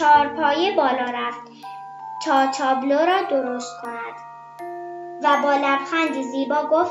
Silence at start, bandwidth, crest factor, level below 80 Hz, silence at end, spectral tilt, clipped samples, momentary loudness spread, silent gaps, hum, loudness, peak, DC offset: 0 s; 11.5 kHz; 16 dB; -68 dBFS; 0 s; -3 dB/octave; under 0.1%; 18 LU; none; none; -21 LUFS; -4 dBFS; under 0.1%